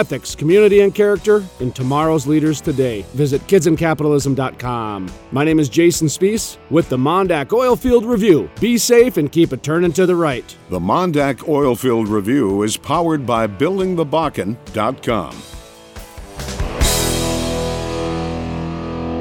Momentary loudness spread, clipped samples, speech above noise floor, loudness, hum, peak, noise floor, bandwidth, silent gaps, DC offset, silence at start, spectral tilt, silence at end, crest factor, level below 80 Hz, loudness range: 11 LU; under 0.1%; 21 dB; -16 LUFS; none; -2 dBFS; -37 dBFS; 17.5 kHz; none; under 0.1%; 0 s; -5.5 dB/octave; 0 s; 16 dB; -34 dBFS; 6 LU